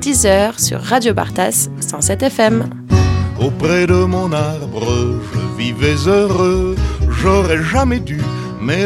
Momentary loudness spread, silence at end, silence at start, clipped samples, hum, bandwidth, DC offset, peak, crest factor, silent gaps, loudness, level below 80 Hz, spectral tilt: 7 LU; 0 s; 0 s; under 0.1%; none; 17 kHz; under 0.1%; 0 dBFS; 14 dB; none; -15 LUFS; -28 dBFS; -5 dB/octave